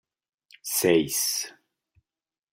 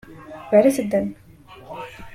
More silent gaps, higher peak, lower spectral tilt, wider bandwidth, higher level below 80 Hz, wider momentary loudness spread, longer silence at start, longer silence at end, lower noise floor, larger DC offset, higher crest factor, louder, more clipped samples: neither; second, -8 dBFS vs -2 dBFS; second, -2.5 dB/octave vs -6 dB/octave; about the same, 16 kHz vs 16 kHz; second, -68 dBFS vs -54 dBFS; second, 15 LU vs 22 LU; first, 0.65 s vs 0.1 s; first, 1 s vs 0 s; first, under -90 dBFS vs -42 dBFS; neither; about the same, 20 dB vs 20 dB; second, -24 LUFS vs -19 LUFS; neither